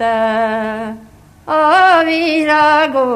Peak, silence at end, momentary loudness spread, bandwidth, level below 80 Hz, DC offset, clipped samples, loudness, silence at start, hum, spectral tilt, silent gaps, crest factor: 0 dBFS; 0 s; 12 LU; 14 kHz; -52 dBFS; under 0.1%; under 0.1%; -12 LUFS; 0 s; none; -4.5 dB/octave; none; 14 dB